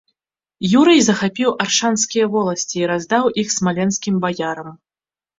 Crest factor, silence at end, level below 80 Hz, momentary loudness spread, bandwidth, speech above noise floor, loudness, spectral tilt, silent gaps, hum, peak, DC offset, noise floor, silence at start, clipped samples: 16 dB; 0.65 s; -58 dBFS; 11 LU; 8 kHz; over 73 dB; -17 LUFS; -4 dB/octave; none; none; -2 dBFS; under 0.1%; under -90 dBFS; 0.6 s; under 0.1%